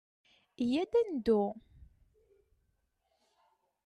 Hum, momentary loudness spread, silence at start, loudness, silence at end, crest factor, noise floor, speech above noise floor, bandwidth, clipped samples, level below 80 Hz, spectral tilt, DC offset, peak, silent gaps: none; 8 LU; 0.6 s; -32 LUFS; 2.25 s; 18 dB; -79 dBFS; 48 dB; 11 kHz; under 0.1%; -64 dBFS; -7 dB/octave; under 0.1%; -18 dBFS; none